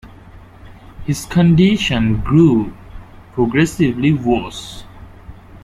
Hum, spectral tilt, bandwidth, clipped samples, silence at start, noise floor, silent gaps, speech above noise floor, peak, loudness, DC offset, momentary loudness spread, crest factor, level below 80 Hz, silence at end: none; -6.5 dB/octave; 14.5 kHz; under 0.1%; 0.05 s; -40 dBFS; none; 25 dB; -2 dBFS; -15 LUFS; under 0.1%; 17 LU; 16 dB; -36 dBFS; 0.05 s